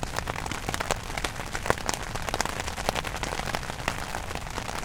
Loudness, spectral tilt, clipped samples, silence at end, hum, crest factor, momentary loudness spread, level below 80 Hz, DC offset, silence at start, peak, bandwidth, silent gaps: -31 LUFS; -3 dB/octave; under 0.1%; 0 s; none; 30 dB; 5 LU; -40 dBFS; under 0.1%; 0 s; 0 dBFS; 19 kHz; none